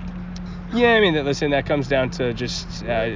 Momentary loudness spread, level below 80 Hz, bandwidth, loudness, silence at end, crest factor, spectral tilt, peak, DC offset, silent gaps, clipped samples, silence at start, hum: 16 LU; -38 dBFS; 7.6 kHz; -20 LUFS; 0 s; 16 dB; -5.5 dB/octave; -4 dBFS; under 0.1%; none; under 0.1%; 0 s; none